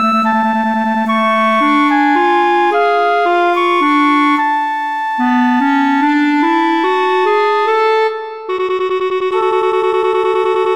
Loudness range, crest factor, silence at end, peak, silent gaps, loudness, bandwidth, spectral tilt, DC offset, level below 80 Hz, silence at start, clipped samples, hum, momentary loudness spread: 2 LU; 10 dB; 0 s; -2 dBFS; none; -13 LUFS; 14 kHz; -5 dB/octave; 0.5%; -62 dBFS; 0 s; under 0.1%; none; 5 LU